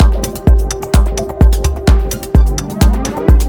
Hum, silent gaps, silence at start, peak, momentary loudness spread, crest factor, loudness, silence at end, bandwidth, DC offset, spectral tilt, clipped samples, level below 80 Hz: none; none; 0 s; 0 dBFS; 3 LU; 10 dB; -14 LUFS; 0 s; 18.5 kHz; under 0.1%; -6 dB/octave; under 0.1%; -12 dBFS